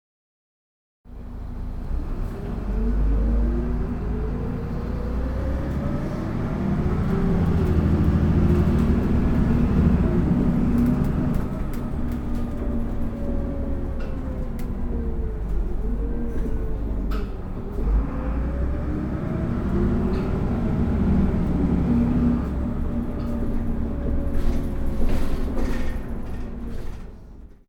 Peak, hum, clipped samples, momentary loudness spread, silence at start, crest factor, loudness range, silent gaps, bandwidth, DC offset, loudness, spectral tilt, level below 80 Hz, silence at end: -8 dBFS; none; under 0.1%; 11 LU; 1.05 s; 14 dB; 9 LU; none; 8.8 kHz; under 0.1%; -25 LUFS; -9.5 dB/octave; -26 dBFS; 0.2 s